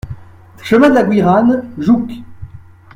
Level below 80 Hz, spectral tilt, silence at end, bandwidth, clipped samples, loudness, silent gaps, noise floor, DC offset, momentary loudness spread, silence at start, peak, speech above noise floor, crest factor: -42 dBFS; -7.5 dB/octave; 0.35 s; 13 kHz; under 0.1%; -12 LUFS; none; -37 dBFS; under 0.1%; 22 LU; 0.05 s; 0 dBFS; 26 dB; 14 dB